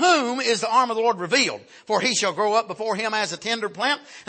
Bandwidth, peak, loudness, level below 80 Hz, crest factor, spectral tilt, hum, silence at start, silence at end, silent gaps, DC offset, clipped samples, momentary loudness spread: 8.8 kHz; -6 dBFS; -22 LUFS; -76 dBFS; 16 dB; -2 dB/octave; none; 0 s; 0.05 s; none; under 0.1%; under 0.1%; 6 LU